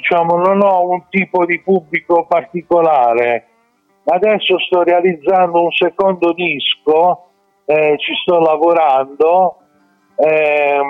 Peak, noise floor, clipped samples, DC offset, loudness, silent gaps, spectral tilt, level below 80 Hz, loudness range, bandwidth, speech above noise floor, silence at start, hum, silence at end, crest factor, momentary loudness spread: -4 dBFS; -58 dBFS; under 0.1%; under 0.1%; -13 LUFS; none; -7.5 dB/octave; -62 dBFS; 1 LU; 5 kHz; 45 dB; 0 s; none; 0 s; 10 dB; 5 LU